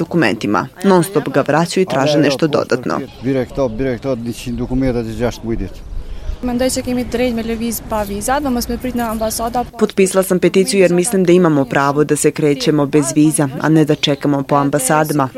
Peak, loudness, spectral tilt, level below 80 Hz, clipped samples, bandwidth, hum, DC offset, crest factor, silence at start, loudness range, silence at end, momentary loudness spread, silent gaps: 0 dBFS; -15 LUFS; -5 dB/octave; -34 dBFS; under 0.1%; 16.5 kHz; none; under 0.1%; 14 dB; 0 s; 7 LU; 0 s; 9 LU; none